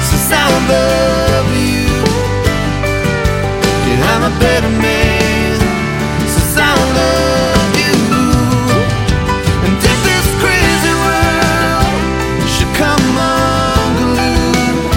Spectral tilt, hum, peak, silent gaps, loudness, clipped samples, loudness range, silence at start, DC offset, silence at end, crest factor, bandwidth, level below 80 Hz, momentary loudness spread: -4.5 dB/octave; none; 0 dBFS; none; -12 LUFS; under 0.1%; 1 LU; 0 s; under 0.1%; 0 s; 12 dB; 17 kHz; -22 dBFS; 4 LU